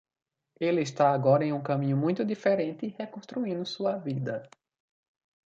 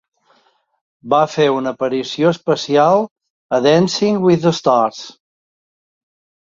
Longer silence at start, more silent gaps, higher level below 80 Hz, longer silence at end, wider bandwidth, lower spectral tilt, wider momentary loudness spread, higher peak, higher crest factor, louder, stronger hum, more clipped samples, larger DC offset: second, 0.6 s vs 1.05 s; second, none vs 3.11-3.16 s, 3.30-3.49 s; second, -74 dBFS vs -60 dBFS; second, 1 s vs 1.4 s; about the same, 7.8 kHz vs 7.6 kHz; first, -7 dB/octave vs -5.5 dB/octave; first, 12 LU vs 8 LU; second, -10 dBFS vs -2 dBFS; about the same, 18 dB vs 16 dB; second, -28 LUFS vs -15 LUFS; neither; neither; neither